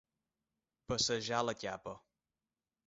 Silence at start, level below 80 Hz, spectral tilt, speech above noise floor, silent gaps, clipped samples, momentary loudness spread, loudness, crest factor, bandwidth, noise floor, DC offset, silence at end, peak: 0.9 s; -66 dBFS; -2.5 dB/octave; over 53 dB; none; under 0.1%; 16 LU; -36 LUFS; 24 dB; 7.6 kHz; under -90 dBFS; under 0.1%; 0.9 s; -18 dBFS